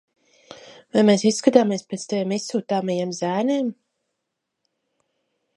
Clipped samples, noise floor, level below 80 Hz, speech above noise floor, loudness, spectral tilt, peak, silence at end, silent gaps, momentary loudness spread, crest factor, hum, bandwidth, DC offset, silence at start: under 0.1%; -80 dBFS; -72 dBFS; 59 dB; -21 LUFS; -5 dB/octave; -2 dBFS; 1.85 s; none; 9 LU; 22 dB; none; 11.5 kHz; under 0.1%; 0.5 s